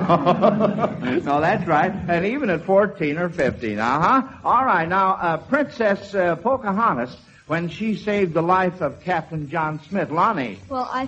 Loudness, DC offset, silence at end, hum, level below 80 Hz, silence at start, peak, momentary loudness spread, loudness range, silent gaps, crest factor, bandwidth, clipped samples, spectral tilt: -21 LUFS; under 0.1%; 0 s; none; -52 dBFS; 0 s; -2 dBFS; 8 LU; 3 LU; none; 18 dB; 8.4 kHz; under 0.1%; -7.5 dB/octave